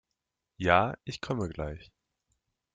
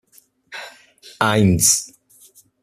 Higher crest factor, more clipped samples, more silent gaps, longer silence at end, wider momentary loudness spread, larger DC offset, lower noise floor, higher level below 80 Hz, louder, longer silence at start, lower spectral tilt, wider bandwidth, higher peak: first, 26 dB vs 20 dB; neither; neither; first, 0.9 s vs 0.75 s; second, 14 LU vs 23 LU; neither; first, -86 dBFS vs -52 dBFS; second, -54 dBFS vs -48 dBFS; second, -30 LUFS vs -16 LUFS; about the same, 0.6 s vs 0.5 s; first, -6 dB/octave vs -3.5 dB/octave; second, 9.4 kHz vs 15 kHz; second, -8 dBFS vs 0 dBFS